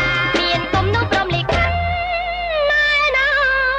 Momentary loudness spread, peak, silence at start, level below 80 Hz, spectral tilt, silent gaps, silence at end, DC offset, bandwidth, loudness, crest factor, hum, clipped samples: 6 LU; -6 dBFS; 0 s; -32 dBFS; -5 dB/octave; none; 0 s; under 0.1%; 9.4 kHz; -17 LUFS; 12 dB; none; under 0.1%